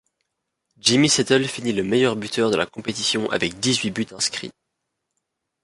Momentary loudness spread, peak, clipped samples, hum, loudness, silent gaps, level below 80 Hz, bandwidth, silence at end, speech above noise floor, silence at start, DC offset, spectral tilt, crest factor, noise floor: 8 LU; -2 dBFS; under 0.1%; none; -21 LUFS; none; -58 dBFS; 11.5 kHz; 1.15 s; 57 dB; 0.85 s; under 0.1%; -3.5 dB/octave; 20 dB; -79 dBFS